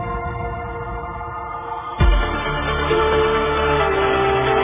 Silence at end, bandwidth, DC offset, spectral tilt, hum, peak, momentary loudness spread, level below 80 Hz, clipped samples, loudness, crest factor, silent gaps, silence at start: 0 s; 3.8 kHz; under 0.1%; -9.5 dB/octave; none; -4 dBFS; 11 LU; -26 dBFS; under 0.1%; -20 LUFS; 16 dB; none; 0 s